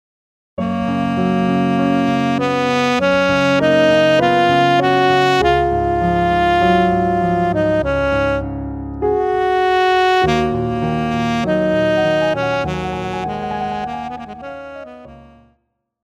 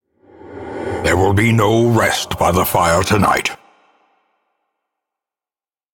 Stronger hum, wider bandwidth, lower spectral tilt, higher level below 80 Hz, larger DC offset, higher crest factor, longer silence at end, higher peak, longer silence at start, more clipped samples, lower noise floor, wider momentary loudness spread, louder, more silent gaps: neither; second, 13.5 kHz vs 18 kHz; about the same, -6 dB/octave vs -5 dB/octave; first, -36 dBFS vs -42 dBFS; neither; about the same, 14 dB vs 16 dB; second, 0.85 s vs 2.4 s; about the same, -4 dBFS vs -2 dBFS; first, 0.6 s vs 0.45 s; neither; second, -66 dBFS vs under -90 dBFS; about the same, 12 LU vs 13 LU; about the same, -16 LUFS vs -15 LUFS; neither